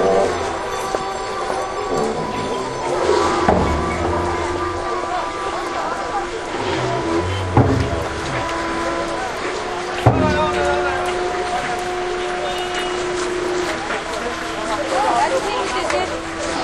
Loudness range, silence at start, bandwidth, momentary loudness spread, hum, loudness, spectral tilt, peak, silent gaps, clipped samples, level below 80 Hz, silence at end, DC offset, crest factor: 2 LU; 0 s; 13 kHz; 7 LU; none; -20 LUFS; -5 dB/octave; 0 dBFS; none; under 0.1%; -36 dBFS; 0 s; under 0.1%; 20 dB